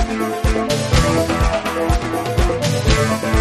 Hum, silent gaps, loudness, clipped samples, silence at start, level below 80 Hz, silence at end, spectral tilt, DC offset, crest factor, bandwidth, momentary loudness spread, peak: none; none; -18 LUFS; under 0.1%; 0 s; -22 dBFS; 0 s; -5 dB/octave; under 0.1%; 16 dB; 13.5 kHz; 4 LU; 0 dBFS